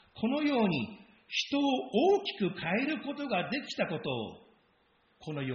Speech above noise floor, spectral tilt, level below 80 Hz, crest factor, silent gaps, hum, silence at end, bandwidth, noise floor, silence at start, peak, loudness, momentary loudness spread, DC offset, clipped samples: 38 dB; -3.5 dB/octave; -70 dBFS; 18 dB; none; none; 0 s; 6.6 kHz; -69 dBFS; 0.15 s; -16 dBFS; -32 LUFS; 10 LU; under 0.1%; under 0.1%